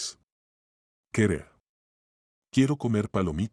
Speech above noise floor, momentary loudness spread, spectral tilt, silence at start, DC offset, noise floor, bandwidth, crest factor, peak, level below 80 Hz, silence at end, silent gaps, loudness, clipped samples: over 65 dB; 9 LU; -6 dB/octave; 0 s; under 0.1%; under -90 dBFS; 12 kHz; 20 dB; -10 dBFS; -54 dBFS; 0.05 s; 0.24-1.04 s, 1.69-2.42 s; -27 LUFS; under 0.1%